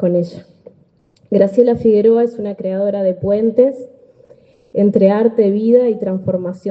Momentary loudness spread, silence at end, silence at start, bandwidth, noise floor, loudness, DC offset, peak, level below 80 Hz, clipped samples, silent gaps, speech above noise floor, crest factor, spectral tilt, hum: 9 LU; 0 s; 0 s; 7.4 kHz; -54 dBFS; -15 LUFS; under 0.1%; 0 dBFS; -54 dBFS; under 0.1%; none; 40 dB; 14 dB; -10 dB/octave; none